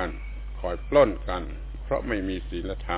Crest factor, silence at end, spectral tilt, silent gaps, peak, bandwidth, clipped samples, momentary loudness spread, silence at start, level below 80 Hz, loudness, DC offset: 20 dB; 0 s; -5 dB/octave; none; -8 dBFS; 4 kHz; under 0.1%; 17 LU; 0 s; -34 dBFS; -27 LUFS; under 0.1%